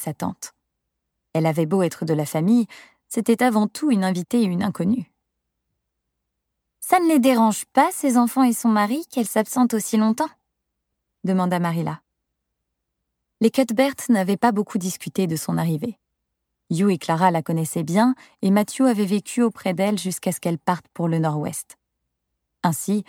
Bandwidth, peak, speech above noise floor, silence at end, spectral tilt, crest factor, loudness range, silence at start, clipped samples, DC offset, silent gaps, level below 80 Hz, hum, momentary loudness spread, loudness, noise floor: 18 kHz; -4 dBFS; 58 dB; 0.05 s; -6 dB/octave; 18 dB; 5 LU; 0 s; under 0.1%; under 0.1%; none; -70 dBFS; none; 10 LU; -21 LUFS; -79 dBFS